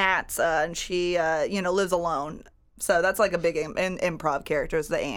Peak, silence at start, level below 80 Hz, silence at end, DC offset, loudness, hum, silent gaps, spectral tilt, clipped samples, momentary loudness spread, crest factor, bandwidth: -8 dBFS; 0 s; -48 dBFS; 0 s; under 0.1%; -26 LUFS; none; none; -4 dB/octave; under 0.1%; 5 LU; 18 dB; over 20 kHz